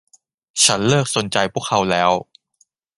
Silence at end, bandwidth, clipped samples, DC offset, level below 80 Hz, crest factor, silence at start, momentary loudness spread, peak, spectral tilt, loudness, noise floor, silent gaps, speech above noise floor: 0.75 s; 11.5 kHz; under 0.1%; under 0.1%; -54 dBFS; 20 dB; 0.55 s; 6 LU; 0 dBFS; -3 dB/octave; -17 LUFS; -62 dBFS; none; 45 dB